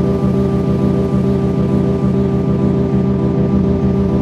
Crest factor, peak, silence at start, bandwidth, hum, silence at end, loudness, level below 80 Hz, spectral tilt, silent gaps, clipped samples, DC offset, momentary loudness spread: 10 dB; -4 dBFS; 0 s; 7 kHz; none; 0 s; -15 LUFS; -28 dBFS; -10 dB/octave; none; under 0.1%; under 0.1%; 1 LU